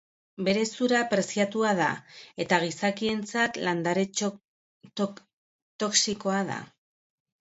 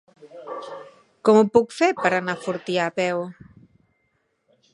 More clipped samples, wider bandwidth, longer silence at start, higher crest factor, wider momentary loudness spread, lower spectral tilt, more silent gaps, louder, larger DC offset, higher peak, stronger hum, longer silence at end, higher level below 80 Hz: neither; second, 8.2 kHz vs 11 kHz; first, 0.4 s vs 0.25 s; about the same, 20 dB vs 22 dB; second, 10 LU vs 20 LU; second, -3.5 dB/octave vs -5.5 dB/octave; first, 4.45-4.80 s, 5.33-5.79 s vs none; second, -27 LUFS vs -21 LUFS; neither; second, -8 dBFS vs -2 dBFS; neither; second, 0.75 s vs 1.4 s; second, -70 dBFS vs -64 dBFS